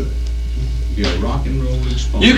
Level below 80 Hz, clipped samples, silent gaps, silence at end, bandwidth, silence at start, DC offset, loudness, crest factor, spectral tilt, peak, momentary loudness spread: -18 dBFS; under 0.1%; none; 0 s; 9.4 kHz; 0 s; under 0.1%; -20 LUFS; 16 dB; -5.5 dB/octave; 0 dBFS; 5 LU